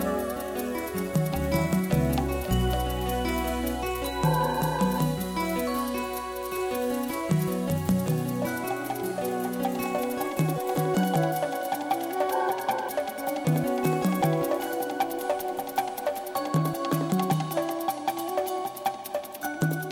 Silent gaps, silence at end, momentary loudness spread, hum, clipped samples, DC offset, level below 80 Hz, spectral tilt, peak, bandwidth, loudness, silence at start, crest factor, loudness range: none; 0 s; 6 LU; none; under 0.1%; under 0.1%; -42 dBFS; -6 dB/octave; -12 dBFS; over 20 kHz; -28 LUFS; 0 s; 16 dB; 1 LU